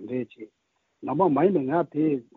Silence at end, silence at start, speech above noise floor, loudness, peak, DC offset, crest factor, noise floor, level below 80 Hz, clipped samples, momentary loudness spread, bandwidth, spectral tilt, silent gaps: 0.15 s; 0 s; 26 dB; -24 LUFS; -8 dBFS; under 0.1%; 18 dB; -50 dBFS; -70 dBFS; under 0.1%; 15 LU; 4.1 kHz; -8 dB/octave; none